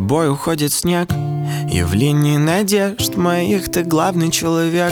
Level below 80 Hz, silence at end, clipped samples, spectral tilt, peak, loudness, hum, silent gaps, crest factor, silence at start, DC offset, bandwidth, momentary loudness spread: -40 dBFS; 0 s; under 0.1%; -5 dB/octave; -2 dBFS; -17 LUFS; none; none; 14 dB; 0 s; under 0.1%; 19.5 kHz; 4 LU